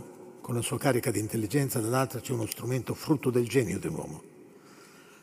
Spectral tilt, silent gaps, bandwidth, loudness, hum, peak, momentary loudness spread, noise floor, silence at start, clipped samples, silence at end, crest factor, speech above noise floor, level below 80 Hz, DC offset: -5.5 dB/octave; none; 16 kHz; -30 LUFS; none; -10 dBFS; 11 LU; -53 dBFS; 0 s; under 0.1%; 0.1 s; 22 dB; 24 dB; -66 dBFS; under 0.1%